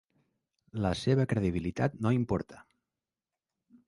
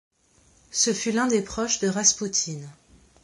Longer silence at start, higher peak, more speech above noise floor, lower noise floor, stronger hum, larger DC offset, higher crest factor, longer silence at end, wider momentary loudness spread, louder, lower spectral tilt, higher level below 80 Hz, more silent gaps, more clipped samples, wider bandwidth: about the same, 0.75 s vs 0.7 s; second, -14 dBFS vs -6 dBFS; first, over 60 dB vs 36 dB; first, under -90 dBFS vs -60 dBFS; neither; neither; about the same, 18 dB vs 22 dB; first, 1.25 s vs 0.5 s; second, 7 LU vs 11 LU; second, -31 LUFS vs -23 LUFS; first, -7.5 dB/octave vs -2.5 dB/octave; about the same, -52 dBFS vs -56 dBFS; neither; neither; about the same, 11.5 kHz vs 11.5 kHz